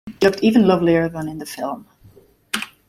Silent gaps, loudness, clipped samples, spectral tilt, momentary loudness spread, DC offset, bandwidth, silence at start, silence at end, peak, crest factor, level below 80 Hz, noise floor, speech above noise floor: none; -19 LUFS; under 0.1%; -6 dB/octave; 14 LU; under 0.1%; 15.5 kHz; 0.05 s; 0.2 s; -2 dBFS; 18 dB; -52 dBFS; -50 dBFS; 33 dB